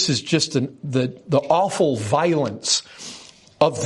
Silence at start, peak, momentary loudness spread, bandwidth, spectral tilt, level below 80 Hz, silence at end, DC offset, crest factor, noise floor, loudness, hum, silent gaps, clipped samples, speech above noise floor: 0 s; -2 dBFS; 14 LU; 11.5 kHz; -4.5 dB/octave; -62 dBFS; 0 s; under 0.1%; 18 dB; -44 dBFS; -21 LUFS; none; none; under 0.1%; 23 dB